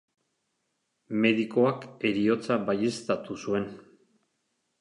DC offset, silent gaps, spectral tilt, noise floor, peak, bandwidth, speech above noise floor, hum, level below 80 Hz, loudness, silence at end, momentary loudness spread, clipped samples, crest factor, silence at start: under 0.1%; none; -6 dB/octave; -78 dBFS; -10 dBFS; 11 kHz; 51 dB; none; -68 dBFS; -27 LUFS; 1 s; 7 LU; under 0.1%; 20 dB; 1.1 s